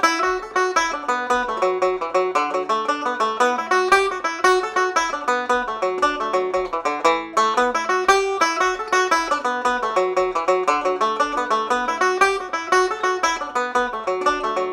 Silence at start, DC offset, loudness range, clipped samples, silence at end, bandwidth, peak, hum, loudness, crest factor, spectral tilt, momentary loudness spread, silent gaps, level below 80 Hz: 0 s; under 0.1%; 1 LU; under 0.1%; 0 s; 16 kHz; -4 dBFS; none; -20 LUFS; 16 dB; -2 dB/octave; 5 LU; none; -52 dBFS